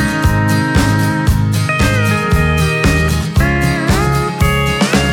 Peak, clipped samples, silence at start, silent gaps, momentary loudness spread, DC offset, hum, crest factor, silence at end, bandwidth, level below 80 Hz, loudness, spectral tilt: 0 dBFS; under 0.1%; 0 s; none; 2 LU; under 0.1%; none; 12 dB; 0 s; 18.5 kHz; -22 dBFS; -13 LUFS; -5.5 dB/octave